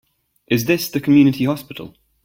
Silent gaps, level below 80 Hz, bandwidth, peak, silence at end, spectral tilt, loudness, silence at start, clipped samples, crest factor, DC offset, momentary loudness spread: none; -54 dBFS; 17 kHz; -2 dBFS; 0.35 s; -6 dB/octave; -17 LUFS; 0.5 s; under 0.1%; 16 dB; under 0.1%; 17 LU